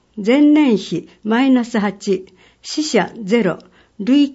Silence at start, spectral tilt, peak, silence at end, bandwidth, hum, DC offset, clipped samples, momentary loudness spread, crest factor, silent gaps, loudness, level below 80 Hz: 0.15 s; -5.5 dB/octave; -2 dBFS; 0 s; 8 kHz; none; under 0.1%; under 0.1%; 14 LU; 14 dB; none; -17 LUFS; -60 dBFS